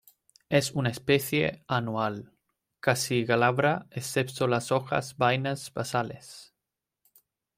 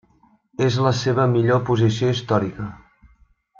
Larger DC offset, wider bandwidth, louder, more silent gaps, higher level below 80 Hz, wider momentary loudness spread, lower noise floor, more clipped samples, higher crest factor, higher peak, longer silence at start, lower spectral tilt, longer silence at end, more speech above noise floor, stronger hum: neither; first, 16.5 kHz vs 7.4 kHz; second, -28 LUFS vs -20 LUFS; neither; second, -64 dBFS vs -54 dBFS; second, 8 LU vs 13 LU; first, -87 dBFS vs -58 dBFS; neither; about the same, 20 dB vs 16 dB; second, -10 dBFS vs -6 dBFS; about the same, 0.5 s vs 0.6 s; second, -5 dB/octave vs -6.5 dB/octave; first, 1.15 s vs 0.8 s; first, 59 dB vs 39 dB; neither